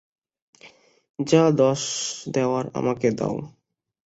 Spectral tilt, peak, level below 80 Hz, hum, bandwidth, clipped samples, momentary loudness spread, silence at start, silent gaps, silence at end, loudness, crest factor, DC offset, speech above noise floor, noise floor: -5 dB/octave; -4 dBFS; -62 dBFS; none; 8.2 kHz; under 0.1%; 14 LU; 0.65 s; 1.10-1.14 s; 0.55 s; -23 LUFS; 20 dB; under 0.1%; 30 dB; -52 dBFS